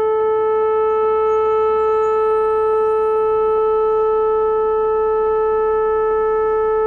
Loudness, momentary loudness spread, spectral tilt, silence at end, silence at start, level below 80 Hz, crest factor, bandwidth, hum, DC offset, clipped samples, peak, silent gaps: -17 LUFS; 1 LU; -6.5 dB/octave; 0 s; 0 s; -44 dBFS; 6 dB; 4.1 kHz; none; under 0.1%; under 0.1%; -10 dBFS; none